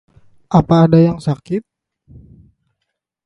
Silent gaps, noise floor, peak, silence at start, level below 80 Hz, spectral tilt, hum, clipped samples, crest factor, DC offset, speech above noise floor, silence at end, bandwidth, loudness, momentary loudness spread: none; -76 dBFS; 0 dBFS; 0.5 s; -44 dBFS; -9 dB/octave; none; under 0.1%; 16 dB; under 0.1%; 63 dB; 1.65 s; 9.6 kHz; -14 LUFS; 13 LU